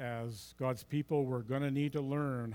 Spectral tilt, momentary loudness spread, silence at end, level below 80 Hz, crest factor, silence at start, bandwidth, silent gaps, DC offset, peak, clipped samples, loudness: -7.5 dB/octave; 6 LU; 0 s; -68 dBFS; 16 dB; 0 s; 18 kHz; none; under 0.1%; -20 dBFS; under 0.1%; -36 LUFS